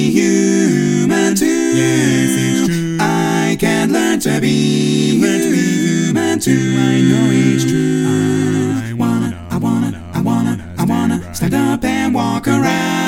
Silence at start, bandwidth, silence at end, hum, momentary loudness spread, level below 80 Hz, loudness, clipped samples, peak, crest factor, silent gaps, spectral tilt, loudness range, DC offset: 0 s; 17 kHz; 0 s; none; 5 LU; -44 dBFS; -14 LUFS; under 0.1%; 0 dBFS; 14 dB; none; -5.5 dB/octave; 3 LU; under 0.1%